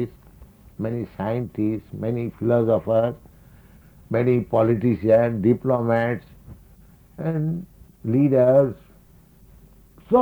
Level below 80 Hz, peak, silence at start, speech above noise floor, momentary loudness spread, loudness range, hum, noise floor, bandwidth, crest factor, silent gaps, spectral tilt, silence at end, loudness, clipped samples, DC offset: -52 dBFS; -6 dBFS; 0 s; 31 dB; 13 LU; 3 LU; none; -51 dBFS; over 20 kHz; 18 dB; none; -10 dB/octave; 0 s; -22 LUFS; under 0.1%; under 0.1%